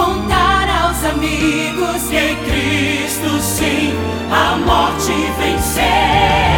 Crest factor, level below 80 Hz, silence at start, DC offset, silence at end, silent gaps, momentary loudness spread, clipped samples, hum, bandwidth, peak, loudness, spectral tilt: 14 dB; -26 dBFS; 0 s; under 0.1%; 0 s; none; 5 LU; under 0.1%; none; 19.5 kHz; 0 dBFS; -15 LUFS; -4 dB/octave